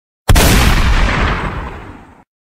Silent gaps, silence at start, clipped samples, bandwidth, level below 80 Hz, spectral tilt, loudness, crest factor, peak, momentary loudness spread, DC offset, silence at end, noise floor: none; 0.3 s; under 0.1%; 16 kHz; -16 dBFS; -4 dB/octave; -13 LUFS; 14 dB; 0 dBFS; 17 LU; under 0.1%; 0.55 s; -35 dBFS